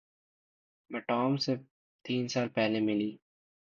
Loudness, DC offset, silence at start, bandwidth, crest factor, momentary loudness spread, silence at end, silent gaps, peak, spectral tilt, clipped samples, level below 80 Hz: -32 LUFS; under 0.1%; 0.9 s; 7.4 kHz; 16 dB; 10 LU; 0.6 s; 1.71-1.99 s; -18 dBFS; -5.5 dB/octave; under 0.1%; -76 dBFS